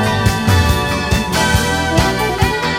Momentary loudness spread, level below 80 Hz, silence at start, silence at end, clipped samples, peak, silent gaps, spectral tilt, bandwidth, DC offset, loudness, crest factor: 3 LU; -24 dBFS; 0 s; 0 s; under 0.1%; 0 dBFS; none; -4.5 dB/octave; 16.5 kHz; under 0.1%; -15 LUFS; 14 dB